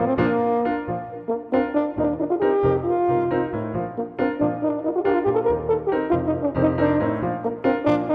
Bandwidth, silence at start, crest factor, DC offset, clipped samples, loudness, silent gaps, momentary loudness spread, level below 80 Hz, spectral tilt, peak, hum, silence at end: 5.2 kHz; 0 s; 16 dB; under 0.1%; under 0.1%; -22 LUFS; none; 7 LU; -48 dBFS; -10 dB/octave; -6 dBFS; none; 0 s